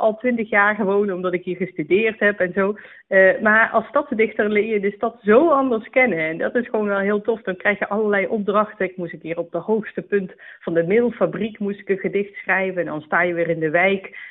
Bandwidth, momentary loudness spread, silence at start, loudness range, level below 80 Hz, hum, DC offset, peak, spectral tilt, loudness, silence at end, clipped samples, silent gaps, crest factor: 4 kHz; 10 LU; 0 s; 5 LU; -62 dBFS; none; under 0.1%; -4 dBFS; -4.5 dB/octave; -20 LUFS; 0 s; under 0.1%; none; 16 dB